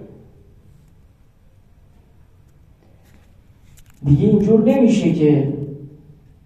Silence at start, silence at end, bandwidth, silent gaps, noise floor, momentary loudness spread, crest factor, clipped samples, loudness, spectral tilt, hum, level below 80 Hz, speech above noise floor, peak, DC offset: 0 s; 0.6 s; 9 kHz; none; -50 dBFS; 15 LU; 18 dB; under 0.1%; -16 LUFS; -8.5 dB/octave; none; -46 dBFS; 37 dB; -2 dBFS; under 0.1%